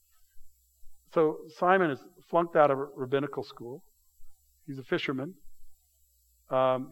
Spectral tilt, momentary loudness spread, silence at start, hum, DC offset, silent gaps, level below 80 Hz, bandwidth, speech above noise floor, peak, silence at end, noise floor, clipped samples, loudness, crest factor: -7 dB/octave; 19 LU; 0.35 s; none; under 0.1%; none; -62 dBFS; 17 kHz; 39 dB; -8 dBFS; 0 s; -67 dBFS; under 0.1%; -29 LUFS; 22 dB